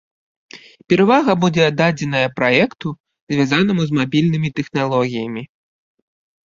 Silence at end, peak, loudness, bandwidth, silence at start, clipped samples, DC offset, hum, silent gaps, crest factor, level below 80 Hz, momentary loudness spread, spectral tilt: 1 s; 0 dBFS; -17 LUFS; 7.6 kHz; 0.55 s; under 0.1%; under 0.1%; none; 3.00-3.04 s, 3.21-3.27 s; 18 dB; -56 dBFS; 12 LU; -6.5 dB/octave